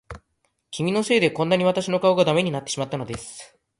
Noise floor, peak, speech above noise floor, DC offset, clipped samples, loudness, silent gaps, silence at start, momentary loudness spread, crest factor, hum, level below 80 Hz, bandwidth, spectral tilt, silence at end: -72 dBFS; -6 dBFS; 50 dB; under 0.1%; under 0.1%; -22 LUFS; none; 0.1 s; 15 LU; 18 dB; none; -54 dBFS; 11.5 kHz; -5 dB/octave; 0.35 s